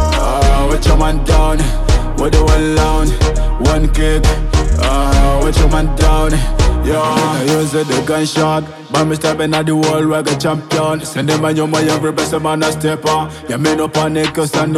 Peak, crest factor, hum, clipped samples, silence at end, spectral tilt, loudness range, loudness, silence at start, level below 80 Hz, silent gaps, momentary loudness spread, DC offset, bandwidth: 0 dBFS; 12 dB; none; under 0.1%; 0 s; -5.5 dB/octave; 2 LU; -14 LUFS; 0 s; -16 dBFS; none; 3 LU; under 0.1%; 14.5 kHz